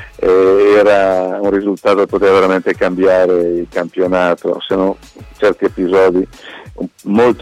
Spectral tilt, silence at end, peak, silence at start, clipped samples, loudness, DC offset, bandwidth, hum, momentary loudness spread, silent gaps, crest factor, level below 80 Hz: -6.5 dB/octave; 0 s; -2 dBFS; 0 s; under 0.1%; -13 LUFS; under 0.1%; 11.5 kHz; none; 11 LU; none; 10 dB; -42 dBFS